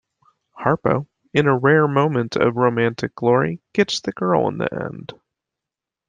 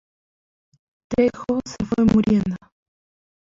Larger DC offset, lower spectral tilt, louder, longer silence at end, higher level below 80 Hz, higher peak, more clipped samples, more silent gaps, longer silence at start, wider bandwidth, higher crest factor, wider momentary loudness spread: neither; about the same, -6.5 dB/octave vs -7.5 dB/octave; about the same, -19 LUFS vs -21 LUFS; about the same, 0.95 s vs 0.95 s; second, -56 dBFS vs -46 dBFS; first, -2 dBFS vs -6 dBFS; neither; neither; second, 0.55 s vs 1.1 s; first, 9.4 kHz vs 7.6 kHz; about the same, 18 dB vs 18 dB; about the same, 10 LU vs 10 LU